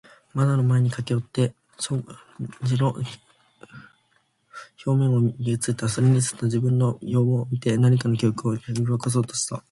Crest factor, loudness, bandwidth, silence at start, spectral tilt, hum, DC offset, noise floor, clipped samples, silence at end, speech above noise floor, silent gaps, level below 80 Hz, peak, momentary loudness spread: 14 dB; -23 LUFS; 11.5 kHz; 0.35 s; -6.5 dB/octave; none; under 0.1%; -67 dBFS; under 0.1%; 0.1 s; 44 dB; none; -58 dBFS; -10 dBFS; 13 LU